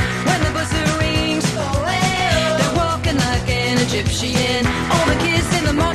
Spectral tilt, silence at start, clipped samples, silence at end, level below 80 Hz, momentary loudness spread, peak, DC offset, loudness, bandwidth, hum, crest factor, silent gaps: -4.5 dB/octave; 0 s; under 0.1%; 0 s; -28 dBFS; 3 LU; -4 dBFS; under 0.1%; -17 LUFS; 13 kHz; none; 14 dB; none